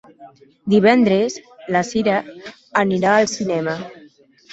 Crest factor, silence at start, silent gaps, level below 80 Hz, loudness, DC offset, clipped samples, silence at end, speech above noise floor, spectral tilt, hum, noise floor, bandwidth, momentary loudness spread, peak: 18 dB; 0.2 s; none; -60 dBFS; -18 LUFS; under 0.1%; under 0.1%; 0.6 s; 31 dB; -5.5 dB/octave; none; -49 dBFS; 8 kHz; 19 LU; -2 dBFS